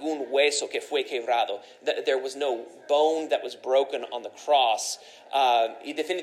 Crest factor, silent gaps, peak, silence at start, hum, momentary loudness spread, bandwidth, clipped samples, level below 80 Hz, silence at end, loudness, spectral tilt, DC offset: 16 dB; none; -10 dBFS; 0 s; none; 10 LU; 14.5 kHz; under 0.1%; under -90 dBFS; 0 s; -26 LUFS; -0.5 dB/octave; under 0.1%